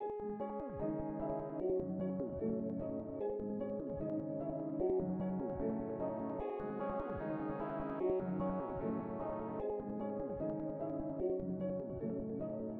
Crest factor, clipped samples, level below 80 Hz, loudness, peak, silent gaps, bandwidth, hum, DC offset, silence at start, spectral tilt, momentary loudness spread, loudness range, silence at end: 14 dB; under 0.1%; -58 dBFS; -40 LUFS; -26 dBFS; none; 3.9 kHz; none; under 0.1%; 0 s; -10 dB/octave; 4 LU; 1 LU; 0 s